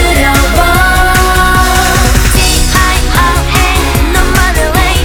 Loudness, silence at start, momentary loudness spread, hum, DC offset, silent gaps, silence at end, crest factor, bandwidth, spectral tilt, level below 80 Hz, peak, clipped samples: -8 LUFS; 0 s; 2 LU; none; under 0.1%; none; 0 s; 8 dB; over 20 kHz; -3.5 dB/octave; -12 dBFS; 0 dBFS; 0.5%